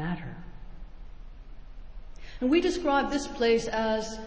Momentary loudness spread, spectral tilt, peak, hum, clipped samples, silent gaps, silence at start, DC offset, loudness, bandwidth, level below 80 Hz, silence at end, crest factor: 24 LU; -5 dB/octave; -12 dBFS; none; under 0.1%; none; 0 s; under 0.1%; -27 LUFS; 8 kHz; -44 dBFS; 0 s; 16 dB